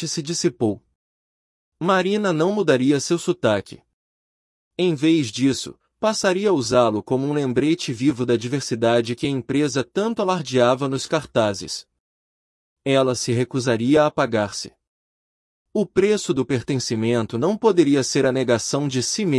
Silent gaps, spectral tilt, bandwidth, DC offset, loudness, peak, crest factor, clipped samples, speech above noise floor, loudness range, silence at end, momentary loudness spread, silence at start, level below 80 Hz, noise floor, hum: 0.95-1.72 s, 3.93-4.71 s, 12.00-12.76 s, 14.88-15.66 s; -5 dB/octave; 12 kHz; under 0.1%; -21 LUFS; -4 dBFS; 18 dB; under 0.1%; over 70 dB; 2 LU; 0 s; 7 LU; 0 s; -60 dBFS; under -90 dBFS; none